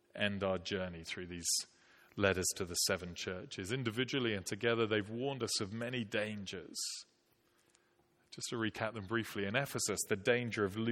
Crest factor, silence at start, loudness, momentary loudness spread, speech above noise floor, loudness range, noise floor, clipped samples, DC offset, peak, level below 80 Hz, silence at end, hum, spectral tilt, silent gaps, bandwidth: 24 dB; 0.15 s; -37 LUFS; 10 LU; 36 dB; 6 LU; -74 dBFS; under 0.1%; under 0.1%; -14 dBFS; -70 dBFS; 0 s; none; -3.5 dB/octave; none; 16.5 kHz